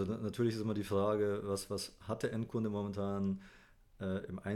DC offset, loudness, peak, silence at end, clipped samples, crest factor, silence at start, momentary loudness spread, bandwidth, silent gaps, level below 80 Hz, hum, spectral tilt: under 0.1%; -38 LUFS; -22 dBFS; 0 s; under 0.1%; 14 dB; 0 s; 8 LU; 16 kHz; none; -64 dBFS; none; -6.5 dB/octave